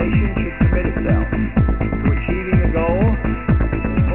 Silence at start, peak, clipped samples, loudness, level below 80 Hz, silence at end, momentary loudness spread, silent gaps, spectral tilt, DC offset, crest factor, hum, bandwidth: 0 s; -2 dBFS; under 0.1%; -18 LUFS; -22 dBFS; 0 s; 3 LU; none; -12 dB/octave; 0.8%; 14 dB; none; 4 kHz